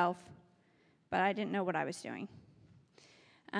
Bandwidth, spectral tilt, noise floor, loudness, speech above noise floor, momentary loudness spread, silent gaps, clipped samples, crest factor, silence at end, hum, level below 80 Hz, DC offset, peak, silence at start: 11 kHz; -5.5 dB/octave; -70 dBFS; -36 LUFS; 34 dB; 15 LU; none; under 0.1%; 20 dB; 0 s; none; -80 dBFS; under 0.1%; -18 dBFS; 0 s